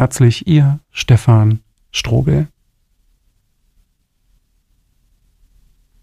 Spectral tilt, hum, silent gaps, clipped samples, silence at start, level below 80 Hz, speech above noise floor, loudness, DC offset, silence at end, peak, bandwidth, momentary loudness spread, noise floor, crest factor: -6.5 dB/octave; none; none; under 0.1%; 0 s; -38 dBFS; 49 dB; -14 LUFS; under 0.1%; 3.55 s; 0 dBFS; 13.5 kHz; 11 LU; -61 dBFS; 16 dB